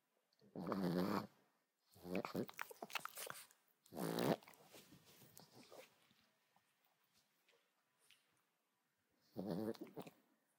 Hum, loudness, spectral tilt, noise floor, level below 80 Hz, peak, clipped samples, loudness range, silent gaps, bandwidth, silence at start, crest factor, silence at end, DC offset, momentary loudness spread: none; -46 LUFS; -5.5 dB/octave; -87 dBFS; -88 dBFS; -24 dBFS; under 0.1%; 20 LU; none; 18 kHz; 0.55 s; 24 dB; 0.5 s; under 0.1%; 22 LU